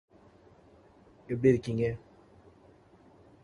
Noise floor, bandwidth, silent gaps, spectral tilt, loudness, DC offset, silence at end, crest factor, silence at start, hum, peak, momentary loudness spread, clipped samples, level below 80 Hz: -59 dBFS; 11 kHz; none; -8.5 dB/octave; -29 LUFS; under 0.1%; 1.45 s; 24 dB; 1.3 s; none; -10 dBFS; 13 LU; under 0.1%; -60 dBFS